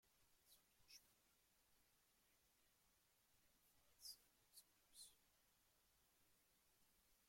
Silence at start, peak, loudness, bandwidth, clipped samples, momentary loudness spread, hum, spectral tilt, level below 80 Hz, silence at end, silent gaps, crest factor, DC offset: 0 s; -48 dBFS; -65 LUFS; 16.5 kHz; under 0.1%; 9 LU; none; 0 dB/octave; under -90 dBFS; 0 s; none; 26 dB; under 0.1%